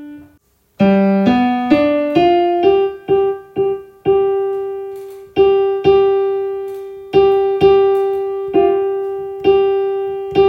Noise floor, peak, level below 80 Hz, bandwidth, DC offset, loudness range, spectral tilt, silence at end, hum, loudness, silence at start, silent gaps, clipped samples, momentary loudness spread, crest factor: -55 dBFS; 0 dBFS; -46 dBFS; 5.6 kHz; under 0.1%; 2 LU; -8 dB/octave; 0 s; none; -15 LUFS; 0 s; none; under 0.1%; 10 LU; 14 dB